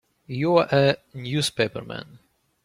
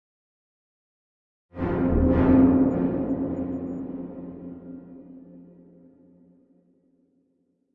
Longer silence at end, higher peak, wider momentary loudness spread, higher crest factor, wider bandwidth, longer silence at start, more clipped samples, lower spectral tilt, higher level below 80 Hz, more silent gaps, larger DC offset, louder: second, 0.6 s vs 2.3 s; first, -4 dBFS vs -8 dBFS; second, 16 LU vs 26 LU; about the same, 20 dB vs 20 dB; first, 15.5 kHz vs 3.5 kHz; second, 0.3 s vs 1.55 s; neither; second, -5 dB/octave vs -12 dB/octave; second, -60 dBFS vs -40 dBFS; neither; neither; about the same, -23 LUFS vs -23 LUFS